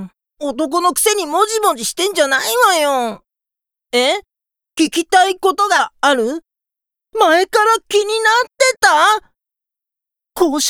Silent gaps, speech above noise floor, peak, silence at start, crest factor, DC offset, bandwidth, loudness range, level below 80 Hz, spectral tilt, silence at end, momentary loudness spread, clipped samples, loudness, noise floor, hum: none; 71 dB; 0 dBFS; 0 s; 16 dB; under 0.1%; over 20 kHz; 3 LU; -58 dBFS; -1 dB/octave; 0 s; 10 LU; under 0.1%; -14 LUFS; -86 dBFS; none